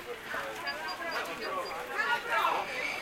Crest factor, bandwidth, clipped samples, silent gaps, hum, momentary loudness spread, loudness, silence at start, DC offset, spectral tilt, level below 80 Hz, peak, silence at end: 18 dB; 16 kHz; under 0.1%; none; none; 8 LU; -33 LUFS; 0 s; under 0.1%; -2 dB/octave; -66 dBFS; -16 dBFS; 0 s